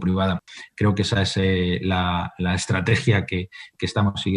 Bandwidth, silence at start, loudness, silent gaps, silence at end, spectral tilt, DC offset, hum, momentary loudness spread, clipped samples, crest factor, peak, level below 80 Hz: 10.5 kHz; 0 s; -22 LUFS; none; 0 s; -5.5 dB/octave; under 0.1%; none; 9 LU; under 0.1%; 16 dB; -6 dBFS; -46 dBFS